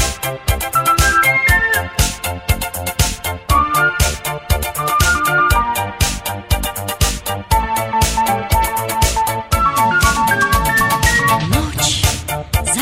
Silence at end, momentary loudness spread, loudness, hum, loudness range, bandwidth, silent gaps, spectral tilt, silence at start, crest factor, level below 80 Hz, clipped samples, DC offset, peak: 0 s; 7 LU; -15 LUFS; none; 3 LU; 16.5 kHz; none; -3 dB/octave; 0 s; 16 dB; -24 dBFS; under 0.1%; under 0.1%; 0 dBFS